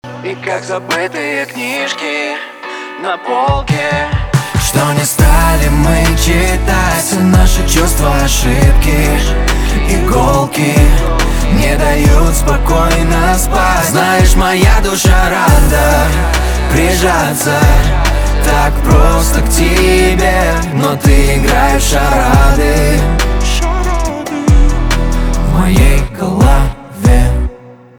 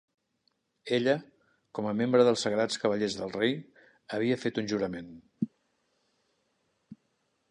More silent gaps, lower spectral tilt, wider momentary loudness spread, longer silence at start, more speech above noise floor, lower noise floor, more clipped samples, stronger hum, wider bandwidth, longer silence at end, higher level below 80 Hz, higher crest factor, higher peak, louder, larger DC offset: neither; about the same, -5 dB/octave vs -5 dB/octave; second, 7 LU vs 14 LU; second, 0.05 s vs 0.85 s; second, 24 dB vs 47 dB; second, -33 dBFS vs -76 dBFS; neither; neither; first, 19.5 kHz vs 10.5 kHz; second, 0.25 s vs 0.55 s; first, -12 dBFS vs -70 dBFS; second, 10 dB vs 22 dB; first, 0 dBFS vs -10 dBFS; first, -11 LUFS vs -29 LUFS; neither